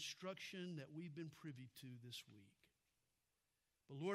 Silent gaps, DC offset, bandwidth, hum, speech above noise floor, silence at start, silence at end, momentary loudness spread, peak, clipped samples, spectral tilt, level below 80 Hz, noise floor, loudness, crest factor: none; under 0.1%; 14 kHz; none; 35 dB; 0 s; 0 s; 9 LU; -32 dBFS; under 0.1%; -4.5 dB/octave; under -90 dBFS; -89 dBFS; -54 LUFS; 22 dB